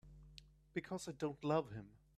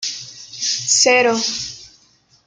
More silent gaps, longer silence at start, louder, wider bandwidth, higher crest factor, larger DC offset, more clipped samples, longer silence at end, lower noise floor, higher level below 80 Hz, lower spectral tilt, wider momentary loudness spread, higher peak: neither; about the same, 0.05 s vs 0 s; second, -43 LUFS vs -16 LUFS; first, 14 kHz vs 11 kHz; about the same, 20 dB vs 18 dB; neither; neither; second, 0.2 s vs 0.6 s; first, -63 dBFS vs -55 dBFS; second, -68 dBFS vs -60 dBFS; first, -6 dB/octave vs -0.5 dB/octave; about the same, 21 LU vs 19 LU; second, -24 dBFS vs -2 dBFS